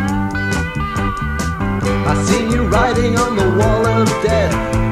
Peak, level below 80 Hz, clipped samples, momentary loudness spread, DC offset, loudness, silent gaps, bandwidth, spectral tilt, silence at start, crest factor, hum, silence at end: 0 dBFS; -26 dBFS; under 0.1%; 6 LU; 0.2%; -16 LUFS; none; 15.5 kHz; -6 dB/octave; 0 s; 14 dB; none; 0 s